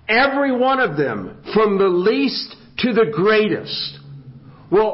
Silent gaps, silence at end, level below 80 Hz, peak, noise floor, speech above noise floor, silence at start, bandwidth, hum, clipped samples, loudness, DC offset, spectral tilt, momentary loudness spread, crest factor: none; 0 s; -54 dBFS; -2 dBFS; -41 dBFS; 24 dB; 0.1 s; 5.8 kHz; none; under 0.1%; -18 LUFS; under 0.1%; -9.5 dB/octave; 10 LU; 16 dB